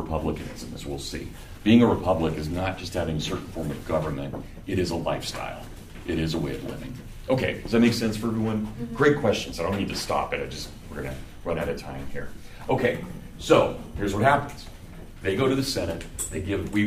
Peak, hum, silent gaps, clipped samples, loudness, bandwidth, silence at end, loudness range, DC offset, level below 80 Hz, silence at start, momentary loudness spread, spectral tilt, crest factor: -4 dBFS; none; none; under 0.1%; -26 LUFS; 15.5 kHz; 0 s; 5 LU; under 0.1%; -42 dBFS; 0 s; 16 LU; -5.5 dB/octave; 22 dB